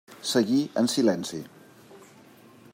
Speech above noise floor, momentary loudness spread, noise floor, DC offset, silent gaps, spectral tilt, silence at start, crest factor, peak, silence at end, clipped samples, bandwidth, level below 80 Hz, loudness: 28 dB; 15 LU; -52 dBFS; under 0.1%; none; -4.5 dB/octave; 0.1 s; 20 dB; -8 dBFS; 0.75 s; under 0.1%; 16 kHz; -76 dBFS; -25 LUFS